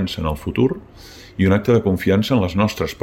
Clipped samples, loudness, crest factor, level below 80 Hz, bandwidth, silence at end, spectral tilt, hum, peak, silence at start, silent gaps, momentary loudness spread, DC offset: under 0.1%; -18 LUFS; 14 dB; -38 dBFS; 16.5 kHz; 0.1 s; -7 dB/octave; none; -4 dBFS; 0 s; none; 7 LU; under 0.1%